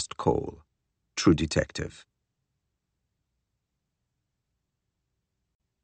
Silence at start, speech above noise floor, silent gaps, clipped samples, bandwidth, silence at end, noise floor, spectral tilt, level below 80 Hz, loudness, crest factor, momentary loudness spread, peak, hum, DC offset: 0 s; 55 dB; none; under 0.1%; 8.4 kHz; 3.85 s; -82 dBFS; -5.5 dB/octave; -50 dBFS; -27 LUFS; 24 dB; 15 LU; -8 dBFS; none; under 0.1%